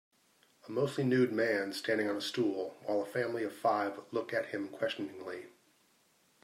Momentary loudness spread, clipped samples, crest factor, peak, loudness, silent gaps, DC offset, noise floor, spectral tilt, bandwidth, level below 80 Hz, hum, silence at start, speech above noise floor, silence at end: 10 LU; under 0.1%; 18 dB; -18 dBFS; -34 LUFS; none; under 0.1%; -70 dBFS; -5.5 dB/octave; 16 kHz; -84 dBFS; none; 0.65 s; 36 dB; 0.95 s